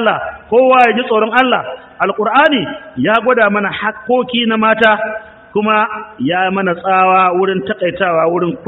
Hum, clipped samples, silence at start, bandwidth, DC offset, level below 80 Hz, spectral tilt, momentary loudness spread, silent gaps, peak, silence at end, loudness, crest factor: none; under 0.1%; 0 s; 6.6 kHz; under 0.1%; -54 dBFS; -2.5 dB/octave; 9 LU; none; 0 dBFS; 0 s; -13 LUFS; 14 dB